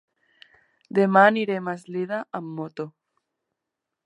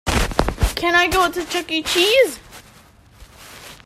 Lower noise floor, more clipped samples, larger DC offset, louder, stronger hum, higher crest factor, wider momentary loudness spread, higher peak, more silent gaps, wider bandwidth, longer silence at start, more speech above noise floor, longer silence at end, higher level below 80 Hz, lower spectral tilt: first, -84 dBFS vs -48 dBFS; neither; neither; second, -23 LUFS vs -18 LUFS; neither; about the same, 22 dB vs 18 dB; about the same, 17 LU vs 15 LU; about the same, -2 dBFS vs -2 dBFS; neither; second, 11 kHz vs 16 kHz; first, 0.95 s vs 0.05 s; first, 62 dB vs 31 dB; first, 1.15 s vs 0.1 s; second, -80 dBFS vs -30 dBFS; first, -7.5 dB/octave vs -3.5 dB/octave